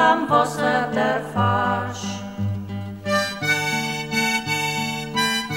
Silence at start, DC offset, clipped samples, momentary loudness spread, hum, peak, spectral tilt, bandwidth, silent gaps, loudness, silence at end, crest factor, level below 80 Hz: 0 s; 0.1%; under 0.1%; 9 LU; none; -4 dBFS; -4 dB/octave; 18 kHz; none; -22 LUFS; 0 s; 18 dB; -56 dBFS